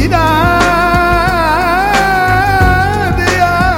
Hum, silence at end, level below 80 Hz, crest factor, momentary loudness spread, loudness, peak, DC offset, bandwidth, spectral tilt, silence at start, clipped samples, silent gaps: none; 0 s; -22 dBFS; 10 dB; 2 LU; -10 LUFS; 0 dBFS; under 0.1%; 16.5 kHz; -5.5 dB/octave; 0 s; under 0.1%; none